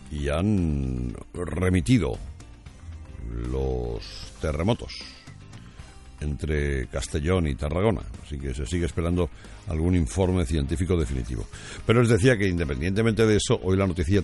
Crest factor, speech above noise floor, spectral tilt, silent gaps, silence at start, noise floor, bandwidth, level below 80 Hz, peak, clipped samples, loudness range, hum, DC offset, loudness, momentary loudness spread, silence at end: 20 dB; 20 dB; -6.5 dB/octave; none; 0 s; -44 dBFS; 11.5 kHz; -36 dBFS; -6 dBFS; under 0.1%; 8 LU; none; under 0.1%; -25 LUFS; 19 LU; 0 s